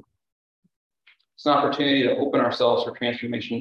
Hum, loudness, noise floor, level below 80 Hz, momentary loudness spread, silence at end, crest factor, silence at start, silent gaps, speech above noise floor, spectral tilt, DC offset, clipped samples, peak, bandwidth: none; -22 LUFS; -57 dBFS; -68 dBFS; 8 LU; 0 s; 18 dB; 1.4 s; none; 35 dB; -6 dB/octave; under 0.1%; under 0.1%; -6 dBFS; 7.2 kHz